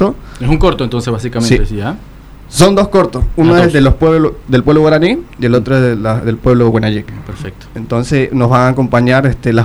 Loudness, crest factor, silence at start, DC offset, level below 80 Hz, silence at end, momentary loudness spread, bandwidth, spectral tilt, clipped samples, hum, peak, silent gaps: -11 LUFS; 10 dB; 0 s; under 0.1%; -24 dBFS; 0 s; 12 LU; 14 kHz; -6.5 dB/octave; under 0.1%; none; 0 dBFS; none